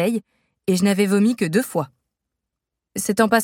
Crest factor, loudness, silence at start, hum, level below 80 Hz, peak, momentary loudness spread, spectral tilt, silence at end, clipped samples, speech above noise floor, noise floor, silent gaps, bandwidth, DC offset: 20 dB; -20 LUFS; 0 s; none; -62 dBFS; -2 dBFS; 12 LU; -5 dB/octave; 0 s; under 0.1%; 64 dB; -83 dBFS; none; 17 kHz; under 0.1%